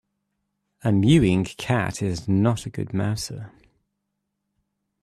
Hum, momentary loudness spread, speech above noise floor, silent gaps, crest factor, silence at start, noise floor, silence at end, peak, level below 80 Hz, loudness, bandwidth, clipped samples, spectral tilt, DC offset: none; 12 LU; 57 dB; none; 18 dB; 0.85 s; -79 dBFS; 1.55 s; -6 dBFS; -48 dBFS; -23 LUFS; 13.5 kHz; under 0.1%; -6.5 dB/octave; under 0.1%